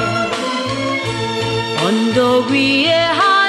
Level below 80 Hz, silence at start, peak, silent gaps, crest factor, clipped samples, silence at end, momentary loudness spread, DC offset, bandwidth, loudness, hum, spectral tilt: -50 dBFS; 0 s; -2 dBFS; none; 14 dB; under 0.1%; 0 s; 7 LU; under 0.1%; 13 kHz; -15 LUFS; none; -4.5 dB/octave